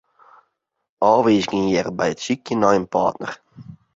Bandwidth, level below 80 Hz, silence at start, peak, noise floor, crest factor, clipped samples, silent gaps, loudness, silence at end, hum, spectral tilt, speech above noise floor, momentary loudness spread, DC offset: 8 kHz; -56 dBFS; 1 s; -2 dBFS; -75 dBFS; 20 dB; under 0.1%; none; -19 LUFS; 0.2 s; none; -5.5 dB/octave; 56 dB; 12 LU; under 0.1%